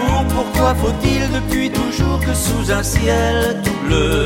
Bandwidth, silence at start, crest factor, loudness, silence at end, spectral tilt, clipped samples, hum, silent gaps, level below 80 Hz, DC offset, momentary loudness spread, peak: 17 kHz; 0 s; 14 dB; -17 LUFS; 0 s; -5 dB/octave; under 0.1%; none; none; -22 dBFS; under 0.1%; 3 LU; -2 dBFS